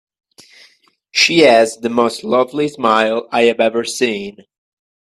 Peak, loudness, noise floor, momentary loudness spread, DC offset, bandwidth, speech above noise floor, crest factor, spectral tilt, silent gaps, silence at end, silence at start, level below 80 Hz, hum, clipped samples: 0 dBFS; -14 LUFS; -53 dBFS; 9 LU; under 0.1%; 13 kHz; 38 dB; 16 dB; -3 dB/octave; none; 0.7 s; 1.15 s; -62 dBFS; none; under 0.1%